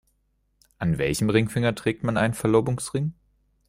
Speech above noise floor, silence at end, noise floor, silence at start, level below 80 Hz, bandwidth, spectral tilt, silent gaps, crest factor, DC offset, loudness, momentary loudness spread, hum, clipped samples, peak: 46 dB; 0.55 s; -70 dBFS; 0.8 s; -50 dBFS; 16 kHz; -6 dB/octave; none; 18 dB; under 0.1%; -24 LUFS; 7 LU; 50 Hz at -50 dBFS; under 0.1%; -6 dBFS